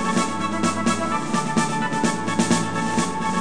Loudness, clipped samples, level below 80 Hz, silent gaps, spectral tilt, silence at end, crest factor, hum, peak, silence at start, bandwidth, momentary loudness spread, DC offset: -22 LUFS; under 0.1%; -56 dBFS; none; -4 dB/octave; 0 s; 16 dB; none; -6 dBFS; 0 s; 10 kHz; 3 LU; 2%